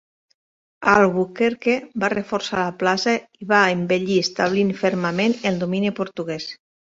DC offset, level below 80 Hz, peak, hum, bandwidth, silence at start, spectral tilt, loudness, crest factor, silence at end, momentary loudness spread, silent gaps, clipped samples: under 0.1%; -60 dBFS; -2 dBFS; none; 7.8 kHz; 0.8 s; -5 dB/octave; -21 LUFS; 20 dB; 0.3 s; 8 LU; none; under 0.1%